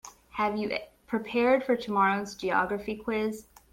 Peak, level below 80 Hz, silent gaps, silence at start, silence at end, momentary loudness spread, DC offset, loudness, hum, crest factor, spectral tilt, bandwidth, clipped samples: -10 dBFS; -60 dBFS; none; 0.05 s; 0.3 s; 10 LU; under 0.1%; -28 LUFS; none; 18 dB; -5 dB/octave; 16.5 kHz; under 0.1%